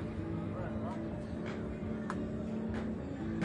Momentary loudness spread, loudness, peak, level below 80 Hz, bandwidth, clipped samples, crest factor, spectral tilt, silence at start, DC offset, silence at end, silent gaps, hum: 2 LU; -39 LUFS; -20 dBFS; -52 dBFS; 10 kHz; under 0.1%; 18 dB; -8.5 dB/octave; 0 s; under 0.1%; 0 s; none; none